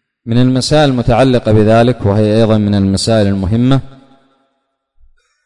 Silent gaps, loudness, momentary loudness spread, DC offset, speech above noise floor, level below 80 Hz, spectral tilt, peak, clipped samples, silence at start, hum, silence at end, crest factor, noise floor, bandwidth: none; -11 LUFS; 4 LU; 1%; 56 dB; -34 dBFS; -6.5 dB/octave; -2 dBFS; under 0.1%; 0.25 s; none; 1.5 s; 10 dB; -66 dBFS; 11 kHz